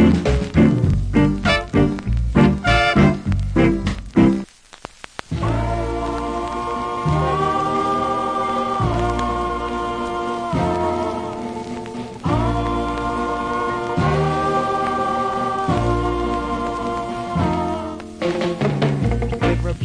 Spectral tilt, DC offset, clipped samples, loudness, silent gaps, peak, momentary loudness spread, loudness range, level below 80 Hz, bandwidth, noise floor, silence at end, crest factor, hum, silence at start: -7 dB/octave; under 0.1%; under 0.1%; -20 LUFS; none; -2 dBFS; 9 LU; 6 LU; -30 dBFS; 10.5 kHz; -40 dBFS; 0 s; 16 dB; none; 0 s